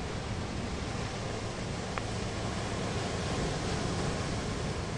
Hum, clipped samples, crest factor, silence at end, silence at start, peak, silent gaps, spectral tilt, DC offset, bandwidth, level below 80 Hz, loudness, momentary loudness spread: none; under 0.1%; 22 dB; 0 s; 0 s; -12 dBFS; none; -5 dB/octave; under 0.1%; 11.5 kHz; -44 dBFS; -35 LUFS; 4 LU